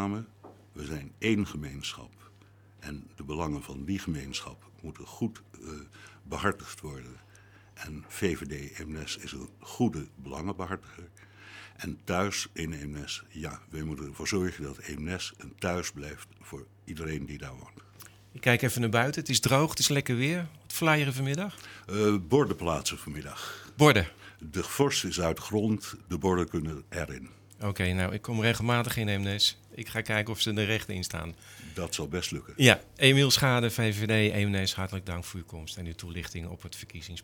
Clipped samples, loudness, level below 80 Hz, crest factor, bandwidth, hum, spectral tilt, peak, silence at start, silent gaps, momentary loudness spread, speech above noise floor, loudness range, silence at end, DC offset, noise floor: under 0.1%; -29 LUFS; -54 dBFS; 28 dB; over 20 kHz; none; -4.5 dB/octave; -2 dBFS; 0 s; none; 20 LU; 27 dB; 12 LU; 0 s; under 0.1%; -57 dBFS